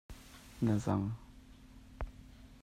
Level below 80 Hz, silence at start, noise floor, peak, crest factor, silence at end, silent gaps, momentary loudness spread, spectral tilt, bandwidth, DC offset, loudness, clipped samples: -52 dBFS; 0.1 s; -56 dBFS; -20 dBFS; 20 dB; 0.05 s; none; 25 LU; -7.5 dB/octave; 14.5 kHz; under 0.1%; -37 LUFS; under 0.1%